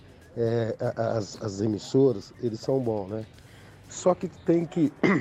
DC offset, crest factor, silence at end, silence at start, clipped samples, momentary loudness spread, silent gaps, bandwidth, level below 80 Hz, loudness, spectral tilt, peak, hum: under 0.1%; 18 dB; 0 s; 0.35 s; under 0.1%; 12 LU; none; 10.5 kHz; -60 dBFS; -27 LUFS; -6.5 dB/octave; -10 dBFS; none